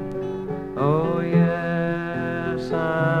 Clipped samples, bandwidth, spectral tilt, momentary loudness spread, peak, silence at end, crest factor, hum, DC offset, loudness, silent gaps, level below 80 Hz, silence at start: under 0.1%; 6.4 kHz; -9 dB/octave; 9 LU; -8 dBFS; 0 s; 16 dB; none; under 0.1%; -23 LUFS; none; -50 dBFS; 0 s